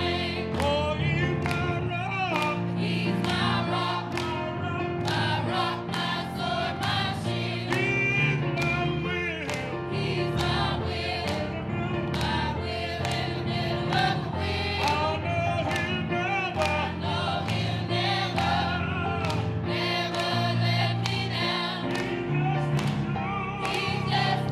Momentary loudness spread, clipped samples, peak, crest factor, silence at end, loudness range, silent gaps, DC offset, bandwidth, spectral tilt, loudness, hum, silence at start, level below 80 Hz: 4 LU; under 0.1%; -8 dBFS; 20 dB; 0 s; 2 LU; none; under 0.1%; 13.5 kHz; -5.5 dB/octave; -27 LUFS; none; 0 s; -46 dBFS